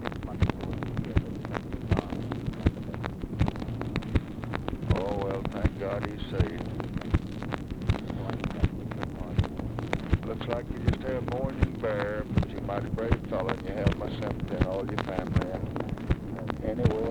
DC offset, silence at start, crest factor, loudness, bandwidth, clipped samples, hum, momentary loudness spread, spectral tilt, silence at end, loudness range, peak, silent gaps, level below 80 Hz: under 0.1%; 0 s; 22 dB; -31 LUFS; 12.5 kHz; under 0.1%; none; 6 LU; -8 dB/octave; 0 s; 2 LU; -8 dBFS; none; -38 dBFS